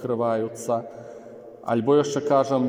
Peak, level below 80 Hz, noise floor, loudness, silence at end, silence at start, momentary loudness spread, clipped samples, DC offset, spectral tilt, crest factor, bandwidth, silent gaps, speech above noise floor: -8 dBFS; -72 dBFS; -42 dBFS; -23 LUFS; 0 s; 0 s; 21 LU; under 0.1%; under 0.1%; -6 dB/octave; 16 dB; 16 kHz; none; 20 dB